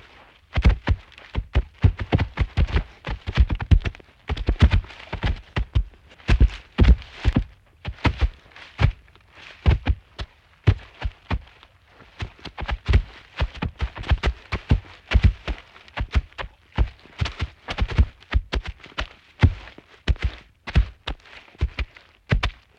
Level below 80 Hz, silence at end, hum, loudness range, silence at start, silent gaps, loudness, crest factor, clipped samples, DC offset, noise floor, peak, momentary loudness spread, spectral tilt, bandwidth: -26 dBFS; 0.25 s; none; 5 LU; 0.55 s; none; -25 LUFS; 22 dB; under 0.1%; under 0.1%; -52 dBFS; -2 dBFS; 16 LU; -7 dB/octave; 7.4 kHz